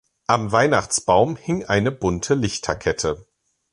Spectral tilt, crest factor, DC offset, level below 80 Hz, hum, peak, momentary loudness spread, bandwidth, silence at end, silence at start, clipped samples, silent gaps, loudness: -4.5 dB/octave; 18 dB; under 0.1%; -44 dBFS; none; -2 dBFS; 7 LU; 11.5 kHz; 0.5 s; 0.3 s; under 0.1%; none; -21 LUFS